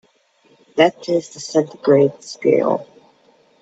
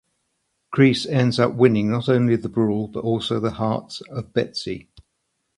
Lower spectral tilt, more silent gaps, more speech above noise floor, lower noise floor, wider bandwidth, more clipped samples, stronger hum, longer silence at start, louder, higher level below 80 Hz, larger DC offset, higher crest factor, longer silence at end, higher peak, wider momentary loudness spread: second, -5.5 dB/octave vs -7 dB/octave; neither; second, 40 dB vs 54 dB; second, -57 dBFS vs -74 dBFS; second, 8.2 kHz vs 11 kHz; neither; neither; about the same, 0.75 s vs 0.7 s; first, -18 LUFS vs -21 LUFS; second, -68 dBFS vs -54 dBFS; neither; about the same, 18 dB vs 20 dB; about the same, 0.8 s vs 0.75 s; about the same, 0 dBFS vs -2 dBFS; second, 7 LU vs 12 LU